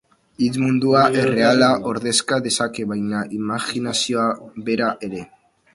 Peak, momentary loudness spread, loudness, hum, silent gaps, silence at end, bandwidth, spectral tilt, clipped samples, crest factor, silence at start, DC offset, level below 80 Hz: 0 dBFS; 9 LU; -19 LUFS; none; none; 0.5 s; 11.5 kHz; -4 dB/octave; under 0.1%; 20 dB; 0.4 s; under 0.1%; -58 dBFS